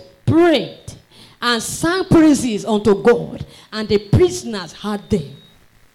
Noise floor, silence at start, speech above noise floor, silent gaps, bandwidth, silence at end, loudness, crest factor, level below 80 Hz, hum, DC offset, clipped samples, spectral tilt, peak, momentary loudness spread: -49 dBFS; 0 s; 33 dB; none; 15.5 kHz; 0.6 s; -17 LUFS; 12 dB; -40 dBFS; none; under 0.1%; under 0.1%; -5.5 dB/octave; -6 dBFS; 16 LU